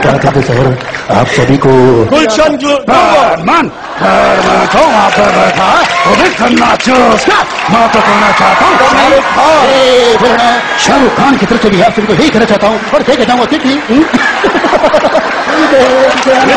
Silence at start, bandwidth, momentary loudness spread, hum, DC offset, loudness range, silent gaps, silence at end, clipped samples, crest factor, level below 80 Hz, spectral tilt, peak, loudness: 0 s; 11.5 kHz; 4 LU; none; under 0.1%; 2 LU; none; 0 s; 1%; 6 dB; -34 dBFS; -4.5 dB/octave; 0 dBFS; -7 LUFS